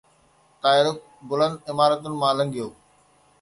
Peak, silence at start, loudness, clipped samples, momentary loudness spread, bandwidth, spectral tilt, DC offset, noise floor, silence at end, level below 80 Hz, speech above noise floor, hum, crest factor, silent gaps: -4 dBFS; 0.65 s; -23 LUFS; under 0.1%; 13 LU; 11.5 kHz; -5 dB/octave; under 0.1%; -60 dBFS; 0.7 s; -66 dBFS; 38 dB; none; 20 dB; none